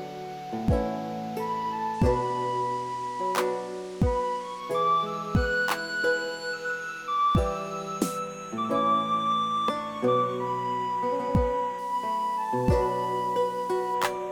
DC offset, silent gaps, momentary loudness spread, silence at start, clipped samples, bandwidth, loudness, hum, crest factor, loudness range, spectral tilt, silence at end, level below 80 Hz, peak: under 0.1%; none; 8 LU; 0 s; under 0.1%; 19 kHz; -28 LUFS; none; 18 dB; 2 LU; -5.5 dB/octave; 0 s; -40 dBFS; -10 dBFS